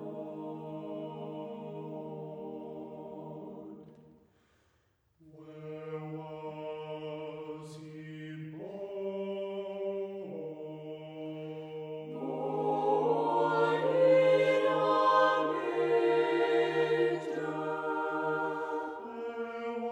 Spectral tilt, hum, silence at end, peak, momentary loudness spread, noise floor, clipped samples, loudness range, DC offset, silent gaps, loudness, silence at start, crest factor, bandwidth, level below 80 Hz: -6.5 dB/octave; none; 0 s; -14 dBFS; 18 LU; -73 dBFS; under 0.1%; 19 LU; under 0.1%; none; -32 LUFS; 0 s; 20 dB; 9.4 kHz; -80 dBFS